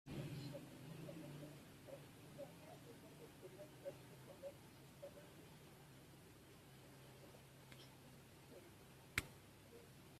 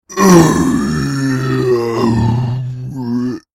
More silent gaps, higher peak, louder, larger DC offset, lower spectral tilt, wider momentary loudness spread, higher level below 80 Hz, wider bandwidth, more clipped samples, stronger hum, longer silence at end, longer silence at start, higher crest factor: neither; second, -20 dBFS vs 0 dBFS; second, -57 LUFS vs -14 LUFS; neither; second, -4.5 dB/octave vs -6 dB/octave; about the same, 12 LU vs 12 LU; second, -74 dBFS vs -38 dBFS; about the same, 15.5 kHz vs 16.5 kHz; neither; neither; second, 0 s vs 0.15 s; about the same, 0.05 s vs 0.1 s; first, 36 dB vs 14 dB